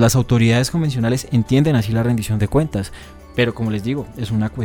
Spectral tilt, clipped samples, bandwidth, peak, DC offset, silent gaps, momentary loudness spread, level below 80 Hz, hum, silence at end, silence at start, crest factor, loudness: -6 dB/octave; under 0.1%; 18 kHz; -2 dBFS; under 0.1%; none; 9 LU; -38 dBFS; none; 0 s; 0 s; 16 dB; -18 LUFS